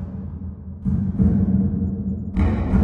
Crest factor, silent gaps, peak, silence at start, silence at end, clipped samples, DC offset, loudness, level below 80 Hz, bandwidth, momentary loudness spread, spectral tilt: 16 dB; none; -6 dBFS; 0 s; 0 s; under 0.1%; under 0.1%; -22 LUFS; -30 dBFS; 4.2 kHz; 13 LU; -11 dB/octave